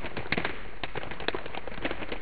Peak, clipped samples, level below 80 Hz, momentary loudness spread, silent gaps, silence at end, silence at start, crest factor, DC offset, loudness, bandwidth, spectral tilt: -8 dBFS; under 0.1%; -48 dBFS; 7 LU; none; 0 s; 0 s; 26 dB; 3%; -34 LUFS; 5.2 kHz; -2.5 dB/octave